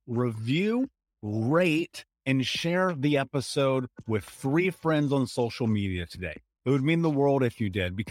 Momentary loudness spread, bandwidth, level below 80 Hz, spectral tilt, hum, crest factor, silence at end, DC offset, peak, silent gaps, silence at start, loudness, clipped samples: 10 LU; 16 kHz; -58 dBFS; -6.5 dB/octave; none; 16 dB; 0 s; under 0.1%; -10 dBFS; none; 0.05 s; -27 LUFS; under 0.1%